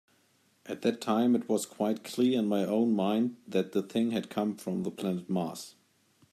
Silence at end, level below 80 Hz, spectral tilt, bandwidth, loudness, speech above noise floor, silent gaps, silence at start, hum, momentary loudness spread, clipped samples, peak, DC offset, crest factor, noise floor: 0.65 s; -78 dBFS; -6 dB/octave; 14.5 kHz; -30 LUFS; 39 dB; none; 0.65 s; none; 8 LU; under 0.1%; -14 dBFS; under 0.1%; 16 dB; -68 dBFS